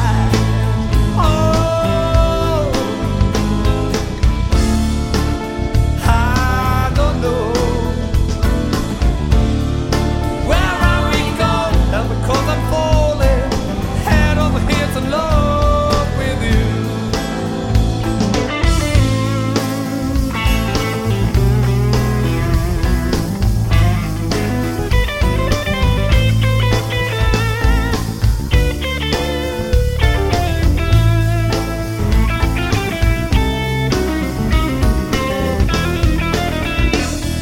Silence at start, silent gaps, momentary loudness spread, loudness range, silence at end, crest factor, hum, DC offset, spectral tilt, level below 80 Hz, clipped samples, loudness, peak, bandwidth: 0 s; none; 4 LU; 1 LU; 0 s; 14 dB; none; under 0.1%; -6 dB/octave; -18 dBFS; under 0.1%; -16 LUFS; 0 dBFS; 16.5 kHz